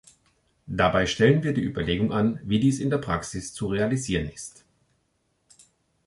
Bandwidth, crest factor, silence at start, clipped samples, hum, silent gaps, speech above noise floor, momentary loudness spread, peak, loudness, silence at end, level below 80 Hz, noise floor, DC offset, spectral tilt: 11.5 kHz; 20 dB; 0.65 s; under 0.1%; none; none; 47 dB; 13 LU; -6 dBFS; -25 LUFS; 1.55 s; -46 dBFS; -72 dBFS; under 0.1%; -5.5 dB/octave